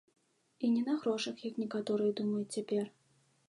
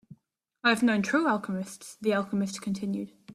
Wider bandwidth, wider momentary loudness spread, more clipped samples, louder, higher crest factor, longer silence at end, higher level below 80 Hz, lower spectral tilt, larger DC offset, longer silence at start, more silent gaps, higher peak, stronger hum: second, 11 kHz vs 14 kHz; second, 6 LU vs 11 LU; neither; second, -35 LUFS vs -28 LUFS; about the same, 16 dB vs 20 dB; first, 0.6 s vs 0 s; second, -86 dBFS vs -70 dBFS; about the same, -5.5 dB/octave vs -5 dB/octave; neither; first, 0.6 s vs 0.1 s; neither; second, -20 dBFS vs -10 dBFS; neither